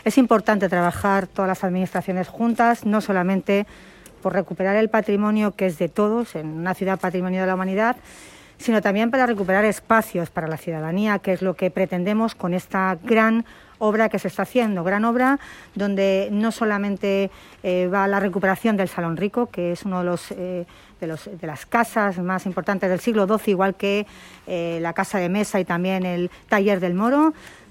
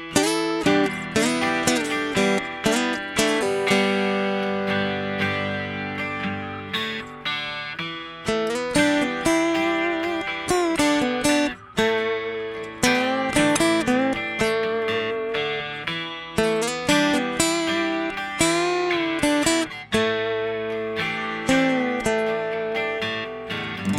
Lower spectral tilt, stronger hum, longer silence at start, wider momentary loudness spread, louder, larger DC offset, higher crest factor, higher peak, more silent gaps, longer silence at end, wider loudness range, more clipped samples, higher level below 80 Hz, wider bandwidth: first, -6.5 dB/octave vs -3.5 dB/octave; neither; about the same, 0.05 s vs 0 s; about the same, 9 LU vs 8 LU; about the same, -22 LUFS vs -23 LUFS; neither; about the same, 18 dB vs 22 dB; about the same, -4 dBFS vs -2 dBFS; neither; first, 0.2 s vs 0 s; about the same, 3 LU vs 4 LU; neither; second, -56 dBFS vs -50 dBFS; about the same, 16 kHz vs 16.5 kHz